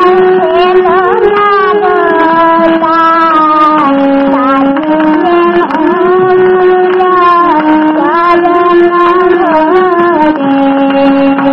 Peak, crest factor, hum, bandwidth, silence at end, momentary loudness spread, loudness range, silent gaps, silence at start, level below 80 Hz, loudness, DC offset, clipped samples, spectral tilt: 0 dBFS; 6 dB; none; 5.8 kHz; 0 s; 2 LU; 1 LU; none; 0 s; -42 dBFS; -7 LUFS; under 0.1%; 1%; -7.5 dB/octave